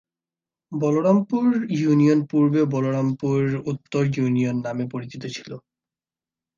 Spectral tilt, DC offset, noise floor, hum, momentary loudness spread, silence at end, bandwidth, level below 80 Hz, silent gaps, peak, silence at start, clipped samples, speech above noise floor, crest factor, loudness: -8 dB/octave; under 0.1%; under -90 dBFS; none; 14 LU; 1 s; 7.4 kHz; -64 dBFS; none; -6 dBFS; 0.7 s; under 0.1%; over 69 dB; 16 dB; -22 LUFS